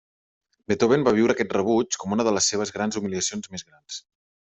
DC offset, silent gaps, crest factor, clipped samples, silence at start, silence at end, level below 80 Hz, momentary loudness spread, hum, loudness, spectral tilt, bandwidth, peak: under 0.1%; none; 18 dB; under 0.1%; 0.7 s; 0.5 s; -60 dBFS; 18 LU; none; -23 LUFS; -4 dB/octave; 8.2 kHz; -6 dBFS